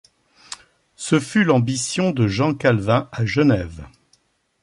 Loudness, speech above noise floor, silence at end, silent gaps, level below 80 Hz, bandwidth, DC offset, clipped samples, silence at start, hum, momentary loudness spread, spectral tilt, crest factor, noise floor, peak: -19 LUFS; 44 dB; 0.75 s; none; -46 dBFS; 11.5 kHz; under 0.1%; under 0.1%; 0.5 s; none; 20 LU; -5.5 dB/octave; 16 dB; -63 dBFS; -4 dBFS